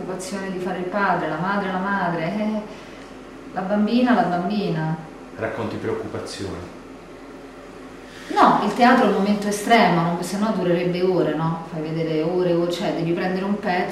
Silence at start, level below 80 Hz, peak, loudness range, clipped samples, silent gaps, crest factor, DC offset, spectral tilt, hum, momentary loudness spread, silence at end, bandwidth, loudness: 0 s; -54 dBFS; -4 dBFS; 9 LU; under 0.1%; none; 18 dB; under 0.1%; -6 dB/octave; none; 22 LU; 0 s; 14.5 kHz; -21 LUFS